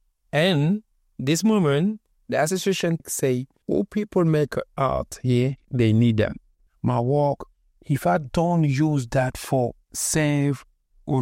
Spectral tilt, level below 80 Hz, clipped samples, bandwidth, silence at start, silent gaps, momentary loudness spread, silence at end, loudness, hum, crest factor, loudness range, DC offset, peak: -6 dB/octave; -48 dBFS; under 0.1%; 16.5 kHz; 0.35 s; none; 8 LU; 0 s; -23 LUFS; none; 14 dB; 1 LU; under 0.1%; -8 dBFS